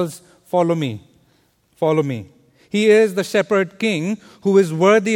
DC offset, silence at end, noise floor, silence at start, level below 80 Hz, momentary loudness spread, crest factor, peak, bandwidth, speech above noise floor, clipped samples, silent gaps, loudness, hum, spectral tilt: under 0.1%; 0 s; -60 dBFS; 0 s; -64 dBFS; 12 LU; 16 dB; -2 dBFS; 16.5 kHz; 43 dB; under 0.1%; none; -18 LUFS; none; -6 dB/octave